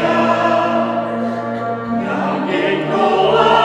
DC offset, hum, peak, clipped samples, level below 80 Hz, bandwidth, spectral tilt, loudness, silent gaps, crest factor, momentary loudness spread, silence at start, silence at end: under 0.1%; none; 0 dBFS; under 0.1%; -54 dBFS; 9.8 kHz; -6 dB/octave; -16 LUFS; none; 16 dB; 8 LU; 0 s; 0 s